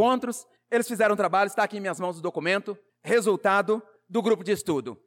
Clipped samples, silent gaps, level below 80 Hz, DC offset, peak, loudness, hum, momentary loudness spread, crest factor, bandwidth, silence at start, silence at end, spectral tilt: under 0.1%; none; -70 dBFS; under 0.1%; -12 dBFS; -26 LUFS; none; 8 LU; 14 dB; 17.5 kHz; 0 s; 0.1 s; -4.5 dB/octave